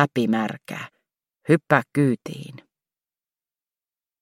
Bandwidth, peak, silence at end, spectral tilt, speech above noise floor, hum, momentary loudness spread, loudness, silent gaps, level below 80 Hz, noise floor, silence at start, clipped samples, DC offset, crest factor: 16 kHz; 0 dBFS; 1.65 s; -7 dB/octave; over 68 dB; none; 19 LU; -22 LUFS; none; -70 dBFS; under -90 dBFS; 0 s; under 0.1%; under 0.1%; 24 dB